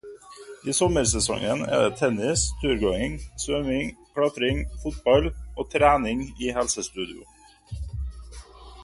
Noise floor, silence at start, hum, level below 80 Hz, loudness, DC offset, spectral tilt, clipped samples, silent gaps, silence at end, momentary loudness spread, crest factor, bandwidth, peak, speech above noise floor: -44 dBFS; 0.05 s; none; -38 dBFS; -25 LUFS; under 0.1%; -4 dB/octave; under 0.1%; none; 0 s; 17 LU; 20 dB; 11.5 kHz; -6 dBFS; 20 dB